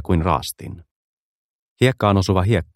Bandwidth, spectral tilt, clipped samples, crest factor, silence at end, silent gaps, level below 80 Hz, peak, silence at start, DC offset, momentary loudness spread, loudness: 14.5 kHz; -6.5 dB/octave; under 0.1%; 18 dB; 0.1 s; 0.91-1.76 s; -38 dBFS; -2 dBFS; 0 s; under 0.1%; 15 LU; -19 LUFS